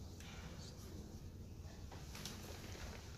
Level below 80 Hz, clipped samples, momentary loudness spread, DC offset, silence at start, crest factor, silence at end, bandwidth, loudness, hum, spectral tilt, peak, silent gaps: -58 dBFS; under 0.1%; 5 LU; under 0.1%; 0 s; 24 dB; 0 s; 15.5 kHz; -52 LUFS; none; -4.5 dB/octave; -28 dBFS; none